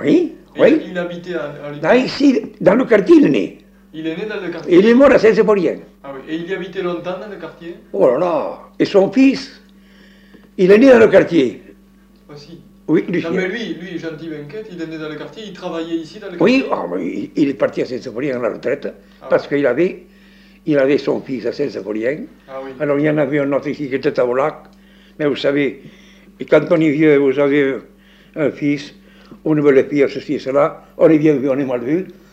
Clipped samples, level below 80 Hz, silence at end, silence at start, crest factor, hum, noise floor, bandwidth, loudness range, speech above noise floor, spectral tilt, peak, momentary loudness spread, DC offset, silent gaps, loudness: under 0.1%; -54 dBFS; 0.2 s; 0 s; 14 dB; none; -48 dBFS; 8.4 kHz; 8 LU; 32 dB; -7 dB/octave; -2 dBFS; 18 LU; under 0.1%; none; -16 LUFS